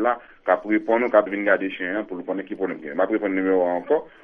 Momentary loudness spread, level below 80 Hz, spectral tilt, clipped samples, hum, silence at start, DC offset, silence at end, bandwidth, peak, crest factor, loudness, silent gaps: 9 LU; -64 dBFS; -8.5 dB/octave; under 0.1%; none; 0 s; under 0.1%; 0.15 s; 3.7 kHz; -2 dBFS; 20 dB; -23 LUFS; none